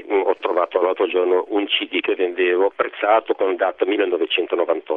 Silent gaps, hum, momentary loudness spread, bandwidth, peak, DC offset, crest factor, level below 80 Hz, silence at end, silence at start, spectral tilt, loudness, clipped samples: none; none; 3 LU; 4.1 kHz; -4 dBFS; under 0.1%; 16 dB; -70 dBFS; 0 s; 0 s; -5.5 dB/octave; -20 LUFS; under 0.1%